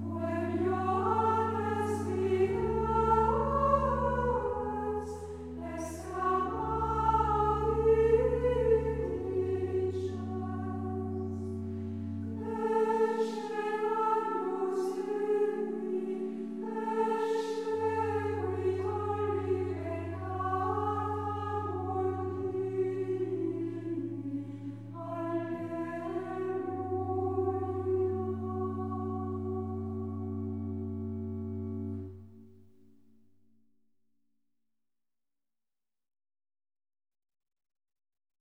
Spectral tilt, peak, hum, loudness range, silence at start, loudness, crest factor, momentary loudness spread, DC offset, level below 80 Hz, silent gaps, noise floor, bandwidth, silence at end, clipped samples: -8 dB/octave; -14 dBFS; none; 8 LU; 0 s; -32 LUFS; 20 dB; 10 LU; 0.1%; -48 dBFS; none; under -90 dBFS; 12.5 kHz; 5.9 s; under 0.1%